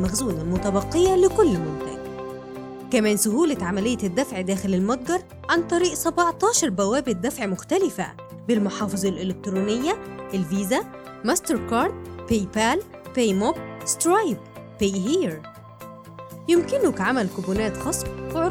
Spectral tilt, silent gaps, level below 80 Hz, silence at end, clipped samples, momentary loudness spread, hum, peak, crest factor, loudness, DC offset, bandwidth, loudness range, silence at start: -4.5 dB/octave; none; -46 dBFS; 0 s; under 0.1%; 14 LU; none; -6 dBFS; 16 dB; -23 LUFS; under 0.1%; 17 kHz; 3 LU; 0 s